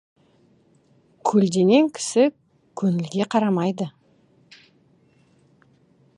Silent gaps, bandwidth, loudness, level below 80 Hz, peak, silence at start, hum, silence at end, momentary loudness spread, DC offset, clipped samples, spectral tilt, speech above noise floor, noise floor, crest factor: none; 11.5 kHz; -21 LUFS; -70 dBFS; -4 dBFS; 1.25 s; none; 2.3 s; 11 LU; under 0.1%; under 0.1%; -6 dB/octave; 39 dB; -59 dBFS; 20 dB